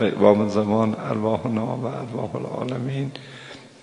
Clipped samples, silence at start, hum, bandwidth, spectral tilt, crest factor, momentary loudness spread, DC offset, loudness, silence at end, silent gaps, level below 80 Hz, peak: under 0.1%; 0 s; none; 10.5 kHz; -7.5 dB/octave; 22 dB; 18 LU; under 0.1%; -23 LUFS; 0.15 s; none; -62 dBFS; 0 dBFS